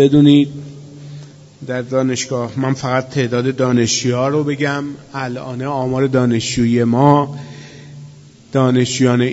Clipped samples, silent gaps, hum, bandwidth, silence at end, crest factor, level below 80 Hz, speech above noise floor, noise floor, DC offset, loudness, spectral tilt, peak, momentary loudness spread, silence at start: under 0.1%; none; none; 8 kHz; 0 s; 16 dB; -50 dBFS; 25 dB; -40 dBFS; under 0.1%; -16 LUFS; -5.5 dB/octave; 0 dBFS; 22 LU; 0 s